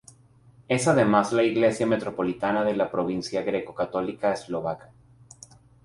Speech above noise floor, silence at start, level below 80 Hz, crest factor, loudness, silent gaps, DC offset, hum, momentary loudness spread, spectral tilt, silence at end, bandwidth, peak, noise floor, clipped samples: 31 dB; 0.7 s; -60 dBFS; 20 dB; -25 LUFS; none; under 0.1%; none; 9 LU; -5.5 dB/octave; 1.05 s; 11.5 kHz; -6 dBFS; -55 dBFS; under 0.1%